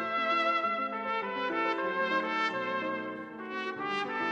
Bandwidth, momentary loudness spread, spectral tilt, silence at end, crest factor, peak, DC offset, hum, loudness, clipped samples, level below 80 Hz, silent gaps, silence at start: 9 kHz; 9 LU; -4.5 dB/octave; 0 s; 16 dB; -16 dBFS; under 0.1%; none; -31 LUFS; under 0.1%; -76 dBFS; none; 0 s